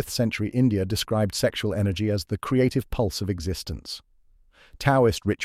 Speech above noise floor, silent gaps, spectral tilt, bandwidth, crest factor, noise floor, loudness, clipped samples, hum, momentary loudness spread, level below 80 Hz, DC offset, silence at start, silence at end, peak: 33 dB; none; -5.5 dB/octave; 16 kHz; 16 dB; -57 dBFS; -25 LUFS; under 0.1%; none; 10 LU; -44 dBFS; under 0.1%; 0 s; 0 s; -8 dBFS